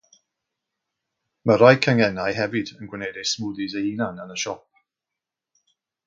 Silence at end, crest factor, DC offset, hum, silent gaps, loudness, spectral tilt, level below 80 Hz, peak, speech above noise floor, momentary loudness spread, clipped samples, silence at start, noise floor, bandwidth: 1.5 s; 24 dB; under 0.1%; none; none; -22 LUFS; -5 dB/octave; -60 dBFS; 0 dBFS; 65 dB; 16 LU; under 0.1%; 1.45 s; -87 dBFS; 7.6 kHz